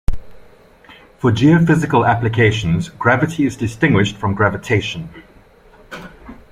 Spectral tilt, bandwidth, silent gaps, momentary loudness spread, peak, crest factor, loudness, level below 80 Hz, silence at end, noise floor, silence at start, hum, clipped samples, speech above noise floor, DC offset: -6.5 dB/octave; 12 kHz; none; 22 LU; 0 dBFS; 16 dB; -16 LUFS; -34 dBFS; 0.2 s; -46 dBFS; 0.1 s; none; under 0.1%; 31 dB; under 0.1%